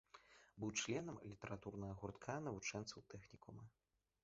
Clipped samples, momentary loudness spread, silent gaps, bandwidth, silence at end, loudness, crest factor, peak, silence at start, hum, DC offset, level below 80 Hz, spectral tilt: under 0.1%; 19 LU; none; 7.6 kHz; 0.55 s; -49 LUFS; 22 dB; -30 dBFS; 0.15 s; none; under 0.1%; -72 dBFS; -4.5 dB/octave